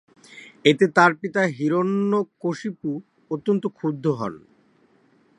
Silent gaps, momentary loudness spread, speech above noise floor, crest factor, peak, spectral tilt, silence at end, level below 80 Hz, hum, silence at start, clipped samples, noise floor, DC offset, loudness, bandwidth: none; 13 LU; 38 dB; 22 dB; 0 dBFS; -6 dB/octave; 1 s; -70 dBFS; none; 0.35 s; under 0.1%; -60 dBFS; under 0.1%; -22 LUFS; 11 kHz